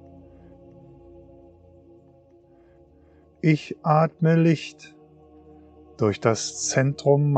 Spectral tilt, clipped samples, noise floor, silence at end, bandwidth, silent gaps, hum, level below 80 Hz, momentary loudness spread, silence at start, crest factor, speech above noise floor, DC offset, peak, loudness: -6 dB/octave; under 0.1%; -55 dBFS; 0 s; 9 kHz; none; none; -62 dBFS; 6 LU; 3.45 s; 20 dB; 34 dB; under 0.1%; -4 dBFS; -22 LUFS